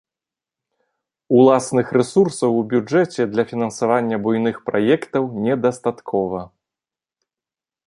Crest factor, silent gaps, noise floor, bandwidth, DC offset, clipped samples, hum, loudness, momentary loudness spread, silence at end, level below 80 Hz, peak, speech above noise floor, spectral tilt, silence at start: 18 dB; none; -90 dBFS; 11.5 kHz; under 0.1%; under 0.1%; none; -19 LUFS; 8 LU; 1.4 s; -60 dBFS; -2 dBFS; 72 dB; -6.5 dB/octave; 1.3 s